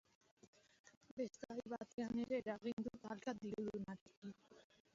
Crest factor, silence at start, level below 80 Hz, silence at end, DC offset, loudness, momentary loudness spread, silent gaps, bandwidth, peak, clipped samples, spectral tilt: 18 dB; 0.45 s; -78 dBFS; 0.35 s; under 0.1%; -48 LUFS; 14 LU; 0.47-0.53 s, 0.79-0.84 s, 0.97-1.01 s, 1.11-1.17 s, 1.93-1.98 s, 2.73-2.77 s, 4.01-4.06 s, 4.17-4.22 s; 7.4 kHz; -30 dBFS; under 0.1%; -5.5 dB/octave